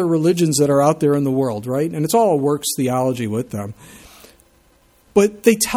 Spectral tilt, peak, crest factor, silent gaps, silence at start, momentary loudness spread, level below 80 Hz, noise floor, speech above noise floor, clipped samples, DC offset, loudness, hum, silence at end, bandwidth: -5.5 dB/octave; 0 dBFS; 18 dB; none; 0 s; 8 LU; -54 dBFS; -55 dBFS; 38 dB; under 0.1%; under 0.1%; -18 LUFS; none; 0 s; 18.5 kHz